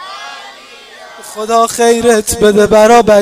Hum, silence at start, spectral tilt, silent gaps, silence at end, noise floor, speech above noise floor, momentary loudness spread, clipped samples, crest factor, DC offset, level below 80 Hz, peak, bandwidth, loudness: none; 0 s; -3.5 dB/octave; none; 0 s; -35 dBFS; 26 dB; 21 LU; 0.4%; 10 dB; under 0.1%; -38 dBFS; 0 dBFS; 16.5 kHz; -8 LUFS